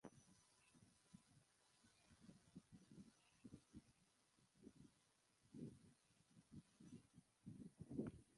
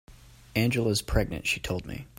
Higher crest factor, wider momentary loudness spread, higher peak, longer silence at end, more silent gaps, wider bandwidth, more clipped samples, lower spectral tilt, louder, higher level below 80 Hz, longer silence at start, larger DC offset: about the same, 26 dB vs 22 dB; first, 15 LU vs 8 LU; second, -36 dBFS vs -8 dBFS; about the same, 0 s vs 0.1 s; neither; second, 11.5 kHz vs 16.5 kHz; neither; first, -6.5 dB/octave vs -5 dB/octave; second, -62 LUFS vs -28 LUFS; second, -82 dBFS vs -40 dBFS; about the same, 0.05 s vs 0.1 s; neither